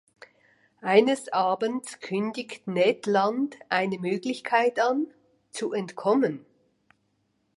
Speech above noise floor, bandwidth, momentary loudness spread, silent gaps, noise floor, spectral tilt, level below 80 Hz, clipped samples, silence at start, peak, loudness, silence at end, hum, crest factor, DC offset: 47 dB; 11.5 kHz; 12 LU; none; -72 dBFS; -5 dB/octave; -78 dBFS; under 0.1%; 0.85 s; -6 dBFS; -26 LUFS; 1.2 s; none; 20 dB; under 0.1%